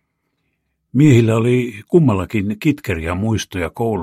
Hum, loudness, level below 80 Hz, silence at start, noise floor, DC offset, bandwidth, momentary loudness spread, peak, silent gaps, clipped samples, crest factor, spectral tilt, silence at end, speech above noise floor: none; -17 LUFS; -42 dBFS; 0.95 s; -70 dBFS; under 0.1%; 15 kHz; 10 LU; -2 dBFS; none; under 0.1%; 16 dB; -7 dB/octave; 0 s; 54 dB